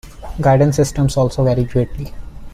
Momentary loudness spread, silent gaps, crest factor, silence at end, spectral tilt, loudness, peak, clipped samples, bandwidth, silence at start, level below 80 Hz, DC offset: 17 LU; none; 14 dB; 0 s; -7 dB/octave; -16 LUFS; -2 dBFS; under 0.1%; 14 kHz; 0.05 s; -32 dBFS; under 0.1%